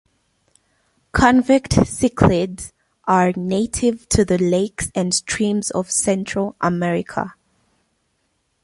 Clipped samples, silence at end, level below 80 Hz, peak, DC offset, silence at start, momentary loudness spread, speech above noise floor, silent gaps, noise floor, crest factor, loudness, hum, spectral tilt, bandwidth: under 0.1%; 1.3 s; -38 dBFS; -2 dBFS; under 0.1%; 1.15 s; 10 LU; 50 dB; none; -68 dBFS; 18 dB; -19 LUFS; none; -5 dB/octave; 11.5 kHz